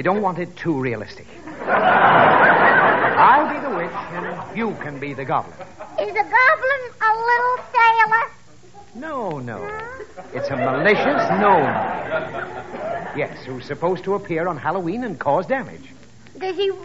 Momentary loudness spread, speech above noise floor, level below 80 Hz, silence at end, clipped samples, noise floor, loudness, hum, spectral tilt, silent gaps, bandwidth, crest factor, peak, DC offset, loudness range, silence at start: 17 LU; 26 dB; -56 dBFS; 0 s; under 0.1%; -46 dBFS; -18 LUFS; none; -3 dB/octave; none; 8 kHz; 18 dB; -2 dBFS; 0.6%; 9 LU; 0 s